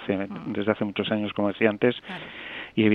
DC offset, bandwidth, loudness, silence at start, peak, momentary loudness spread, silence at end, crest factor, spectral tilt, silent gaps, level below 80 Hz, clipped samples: under 0.1%; 4.9 kHz; -27 LUFS; 0 s; -4 dBFS; 13 LU; 0 s; 22 dB; -8.5 dB/octave; none; -64 dBFS; under 0.1%